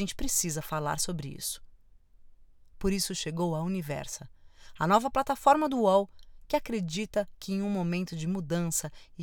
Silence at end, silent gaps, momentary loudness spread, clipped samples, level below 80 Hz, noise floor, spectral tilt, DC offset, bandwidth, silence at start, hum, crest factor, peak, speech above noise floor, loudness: 0 s; none; 11 LU; under 0.1%; -50 dBFS; -56 dBFS; -4.5 dB/octave; under 0.1%; 20 kHz; 0 s; none; 22 dB; -8 dBFS; 27 dB; -30 LUFS